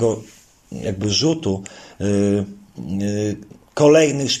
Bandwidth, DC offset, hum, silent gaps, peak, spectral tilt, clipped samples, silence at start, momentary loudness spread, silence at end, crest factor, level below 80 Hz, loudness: 13.5 kHz; under 0.1%; none; none; -2 dBFS; -5 dB/octave; under 0.1%; 0 s; 19 LU; 0 s; 18 dB; -52 dBFS; -19 LUFS